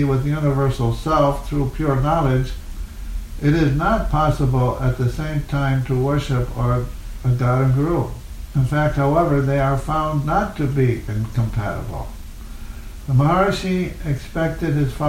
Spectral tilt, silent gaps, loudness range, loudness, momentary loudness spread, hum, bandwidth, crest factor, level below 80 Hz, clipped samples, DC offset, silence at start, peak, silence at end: -7.5 dB/octave; none; 3 LU; -20 LUFS; 15 LU; none; 15.5 kHz; 16 dB; -30 dBFS; under 0.1%; under 0.1%; 0 s; -4 dBFS; 0 s